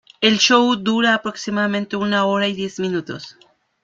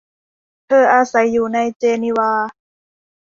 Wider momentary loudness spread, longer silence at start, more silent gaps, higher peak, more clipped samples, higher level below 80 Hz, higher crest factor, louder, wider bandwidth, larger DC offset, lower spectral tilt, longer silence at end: first, 12 LU vs 7 LU; second, 0.2 s vs 0.7 s; second, none vs 1.76-1.80 s; about the same, -2 dBFS vs -2 dBFS; neither; about the same, -62 dBFS vs -62 dBFS; about the same, 18 dB vs 16 dB; about the same, -18 LUFS vs -16 LUFS; about the same, 7.6 kHz vs 7.4 kHz; neither; second, -3.5 dB/octave vs -5 dB/octave; second, 0.5 s vs 0.75 s